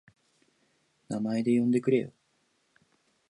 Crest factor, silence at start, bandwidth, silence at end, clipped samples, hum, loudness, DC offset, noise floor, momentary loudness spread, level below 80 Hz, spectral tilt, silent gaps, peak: 18 dB; 1.1 s; 10.5 kHz; 1.2 s; under 0.1%; none; -28 LUFS; under 0.1%; -72 dBFS; 12 LU; -76 dBFS; -7.5 dB/octave; none; -12 dBFS